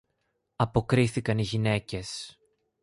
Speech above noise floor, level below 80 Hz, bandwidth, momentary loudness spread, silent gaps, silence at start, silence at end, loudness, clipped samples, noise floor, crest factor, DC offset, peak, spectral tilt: 50 dB; -50 dBFS; 11.5 kHz; 13 LU; none; 0.6 s; 0.5 s; -28 LUFS; under 0.1%; -77 dBFS; 20 dB; under 0.1%; -8 dBFS; -6 dB/octave